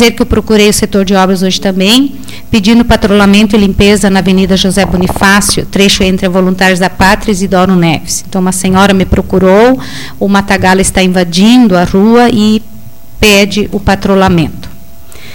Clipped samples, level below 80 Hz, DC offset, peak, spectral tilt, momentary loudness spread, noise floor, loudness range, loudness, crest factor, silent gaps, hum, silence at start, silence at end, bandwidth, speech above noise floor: 0.7%; -24 dBFS; 4%; 0 dBFS; -4.5 dB/octave; 6 LU; -33 dBFS; 2 LU; -7 LUFS; 8 dB; none; none; 0 s; 0 s; 17.5 kHz; 26 dB